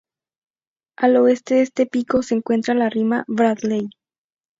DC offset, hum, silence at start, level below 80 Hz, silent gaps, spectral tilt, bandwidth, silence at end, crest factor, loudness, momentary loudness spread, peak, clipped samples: under 0.1%; none; 1 s; -60 dBFS; none; -6 dB/octave; 7.8 kHz; 0.7 s; 18 dB; -19 LUFS; 7 LU; -2 dBFS; under 0.1%